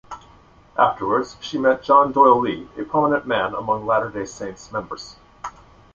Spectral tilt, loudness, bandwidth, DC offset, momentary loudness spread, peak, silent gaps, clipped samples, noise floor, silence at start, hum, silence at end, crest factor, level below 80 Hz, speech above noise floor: -5.5 dB/octave; -20 LUFS; 7.6 kHz; under 0.1%; 21 LU; -2 dBFS; none; under 0.1%; -50 dBFS; 0.1 s; none; 0.45 s; 20 dB; -54 dBFS; 30 dB